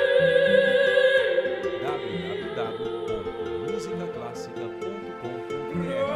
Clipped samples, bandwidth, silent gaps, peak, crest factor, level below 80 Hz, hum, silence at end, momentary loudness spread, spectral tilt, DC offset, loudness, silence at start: under 0.1%; 11 kHz; none; -8 dBFS; 16 dB; -58 dBFS; none; 0 s; 15 LU; -5.5 dB/octave; under 0.1%; -25 LUFS; 0 s